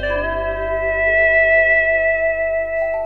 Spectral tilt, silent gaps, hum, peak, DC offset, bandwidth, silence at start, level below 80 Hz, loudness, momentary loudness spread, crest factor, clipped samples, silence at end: -6.5 dB/octave; none; none; -6 dBFS; 0.9%; 5.6 kHz; 0 s; -34 dBFS; -16 LUFS; 9 LU; 12 dB; under 0.1%; 0 s